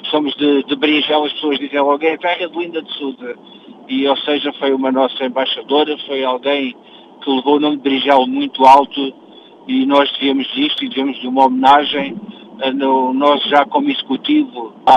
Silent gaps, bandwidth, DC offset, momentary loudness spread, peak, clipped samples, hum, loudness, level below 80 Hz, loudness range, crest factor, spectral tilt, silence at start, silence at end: none; 7.8 kHz; under 0.1%; 12 LU; 0 dBFS; under 0.1%; none; -15 LUFS; -64 dBFS; 5 LU; 16 dB; -5 dB/octave; 0 s; 0 s